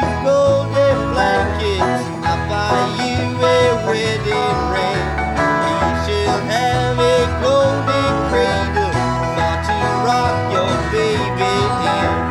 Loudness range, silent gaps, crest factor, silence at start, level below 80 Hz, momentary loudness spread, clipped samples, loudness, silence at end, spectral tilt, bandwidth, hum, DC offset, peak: 1 LU; none; 14 dB; 0 s; -32 dBFS; 4 LU; under 0.1%; -17 LUFS; 0 s; -5.5 dB/octave; 13 kHz; none; under 0.1%; -2 dBFS